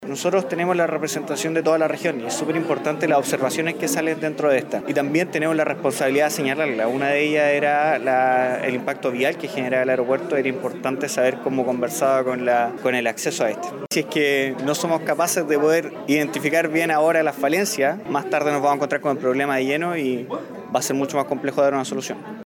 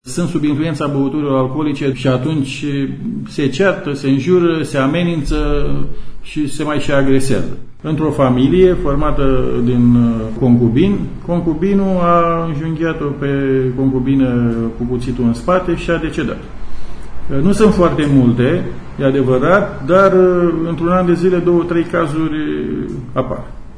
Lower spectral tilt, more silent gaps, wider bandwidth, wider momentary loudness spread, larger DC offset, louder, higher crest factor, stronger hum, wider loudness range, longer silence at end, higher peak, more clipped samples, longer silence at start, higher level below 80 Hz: second, -4 dB/octave vs -7.5 dB/octave; neither; first, 19 kHz vs 11 kHz; second, 6 LU vs 10 LU; neither; second, -21 LUFS vs -15 LUFS; about the same, 14 dB vs 14 dB; neither; about the same, 2 LU vs 4 LU; about the same, 0 s vs 0 s; second, -8 dBFS vs 0 dBFS; neither; about the same, 0 s vs 0.05 s; second, -74 dBFS vs -28 dBFS